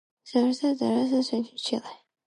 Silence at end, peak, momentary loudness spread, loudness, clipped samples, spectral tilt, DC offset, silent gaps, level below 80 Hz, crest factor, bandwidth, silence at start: 0.35 s; -10 dBFS; 7 LU; -27 LUFS; under 0.1%; -5 dB/octave; under 0.1%; none; -80 dBFS; 16 dB; 11 kHz; 0.25 s